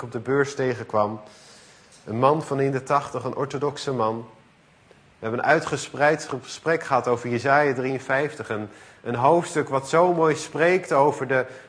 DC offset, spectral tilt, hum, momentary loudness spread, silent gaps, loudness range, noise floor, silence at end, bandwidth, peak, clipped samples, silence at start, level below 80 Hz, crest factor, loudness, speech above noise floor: under 0.1%; -5.5 dB/octave; none; 11 LU; none; 4 LU; -56 dBFS; 0 s; 10.5 kHz; -4 dBFS; under 0.1%; 0 s; -64 dBFS; 20 dB; -23 LUFS; 33 dB